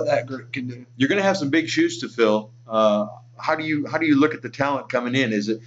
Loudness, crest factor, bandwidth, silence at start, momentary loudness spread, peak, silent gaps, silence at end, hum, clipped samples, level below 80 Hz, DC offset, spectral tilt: -22 LUFS; 16 dB; 8 kHz; 0 s; 11 LU; -6 dBFS; none; 0 s; none; under 0.1%; -68 dBFS; under 0.1%; -5.5 dB/octave